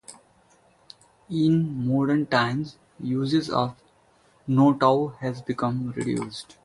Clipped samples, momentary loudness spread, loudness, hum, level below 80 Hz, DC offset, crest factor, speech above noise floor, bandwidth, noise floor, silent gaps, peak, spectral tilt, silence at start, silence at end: under 0.1%; 11 LU; -24 LUFS; none; -60 dBFS; under 0.1%; 20 dB; 37 dB; 11.5 kHz; -60 dBFS; none; -6 dBFS; -7 dB/octave; 0.1 s; 0.2 s